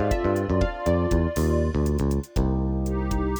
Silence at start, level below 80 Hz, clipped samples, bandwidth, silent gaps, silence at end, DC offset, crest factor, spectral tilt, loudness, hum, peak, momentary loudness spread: 0 s; -28 dBFS; under 0.1%; over 20 kHz; none; 0 s; under 0.1%; 14 dB; -7.5 dB/octave; -25 LUFS; none; -10 dBFS; 3 LU